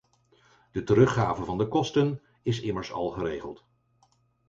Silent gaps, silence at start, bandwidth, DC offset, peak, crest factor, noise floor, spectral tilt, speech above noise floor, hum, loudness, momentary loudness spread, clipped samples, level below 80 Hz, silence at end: none; 0.75 s; 7.8 kHz; under 0.1%; -8 dBFS; 20 dB; -67 dBFS; -7 dB/octave; 41 dB; none; -27 LUFS; 14 LU; under 0.1%; -54 dBFS; 0.95 s